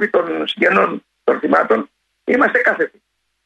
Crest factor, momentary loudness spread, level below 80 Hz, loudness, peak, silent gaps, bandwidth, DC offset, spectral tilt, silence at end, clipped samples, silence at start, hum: 16 dB; 9 LU; -64 dBFS; -16 LUFS; -2 dBFS; none; 9 kHz; under 0.1%; -6 dB/octave; 0.6 s; under 0.1%; 0 s; none